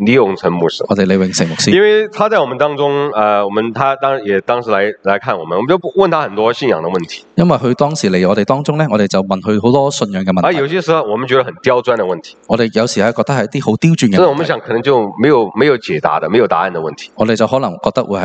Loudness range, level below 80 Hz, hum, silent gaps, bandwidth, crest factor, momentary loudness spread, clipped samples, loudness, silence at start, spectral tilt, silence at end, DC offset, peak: 2 LU; -52 dBFS; none; none; 9 kHz; 12 dB; 5 LU; under 0.1%; -13 LUFS; 0 s; -5.5 dB/octave; 0 s; under 0.1%; 0 dBFS